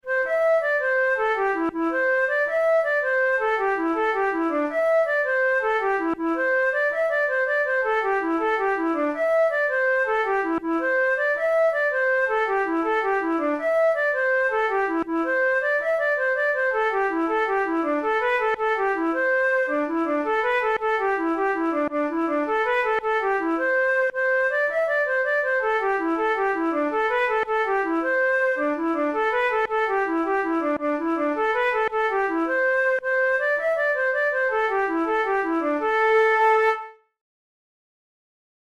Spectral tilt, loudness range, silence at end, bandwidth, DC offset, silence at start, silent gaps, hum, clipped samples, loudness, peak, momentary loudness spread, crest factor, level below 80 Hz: -4.5 dB/octave; 1 LU; 1.7 s; 12.5 kHz; under 0.1%; 0.05 s; none; none; under 0.1%; -22 LUFS; -10 dBFS; 3 LU; 12 dB; -58 dBFS